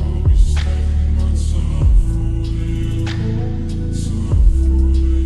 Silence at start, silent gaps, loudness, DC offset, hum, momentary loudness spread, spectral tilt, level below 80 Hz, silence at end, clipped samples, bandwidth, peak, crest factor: 0 s; none; -18 LUFS; under 0.1%; none; 6 LU; -7.5 dB/octave; -16 dBFS; 0 s; under 0.1%; 10.5 kHz; -2 dBFS; 12 dB